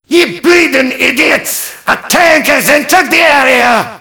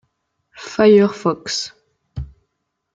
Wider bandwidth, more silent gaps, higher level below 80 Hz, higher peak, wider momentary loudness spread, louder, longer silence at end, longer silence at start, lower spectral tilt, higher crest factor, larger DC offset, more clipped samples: first, over 20 kHz vs 7.8 kHz; neither; about the same, -44 dBFS vs -44 dBFS; about the same, 0 dBFS vs -2 dBFS; second, 7 LU vs 24 LU; first, -8 LUFS vs -16 LUFS; second, 0.05 s vs 0.7 s; second, 0.1 s vs 0.6 s; second, -2 dB/octave vs -5 dB/octave; second, 8 dB vs 18 dB; neither; first, 3% vs under 0.1%